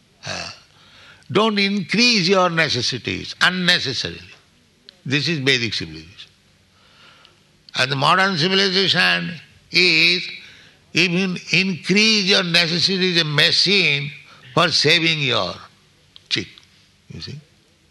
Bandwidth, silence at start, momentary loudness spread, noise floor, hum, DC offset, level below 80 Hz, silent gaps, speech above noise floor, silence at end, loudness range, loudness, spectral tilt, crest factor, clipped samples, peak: 12 kHz; 0.25 s; 17 LU; -56 dBFS; none; under 0.1%; -60 dBFS; none; 37 dB; 0.5 s; 7 LU; -17 LUFS; -3.5 dB/octave; 18 dB; under 0.1%; -2 dBFS